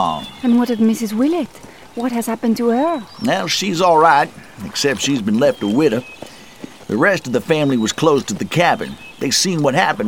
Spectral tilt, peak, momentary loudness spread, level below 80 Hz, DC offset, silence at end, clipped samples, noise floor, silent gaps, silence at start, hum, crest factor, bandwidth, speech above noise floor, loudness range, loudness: -4 dB/octave; 0 dBFS; 13 LU; -54 dBFS; 0.4%; 0 s; under 0.1%; -37 dBFS; none; 0 s; none; 16 dB; 16.5 kHz; 20 dB; 2 LU; -17 LUFS